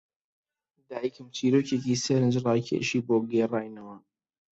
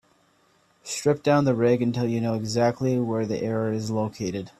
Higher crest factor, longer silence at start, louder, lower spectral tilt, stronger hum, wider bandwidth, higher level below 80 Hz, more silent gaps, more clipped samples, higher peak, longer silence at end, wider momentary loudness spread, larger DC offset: about the same, 18 dB vs 18 dB; about the same, 0.9 s vs 0.85 s; second, -27 LUFS vs -24 LUFS; about the same, -6 dB/octave vs -6.5 dB/octave; neither; second, 8.2 kHz vs 13 kHz; second, -68 dBFS vs -60 dBFS; neither; neither; second, -12 dBFS vs -6 dBFS; first, 0.55 s vs 0.1 s; first, 15 LU vs 7 LU; neither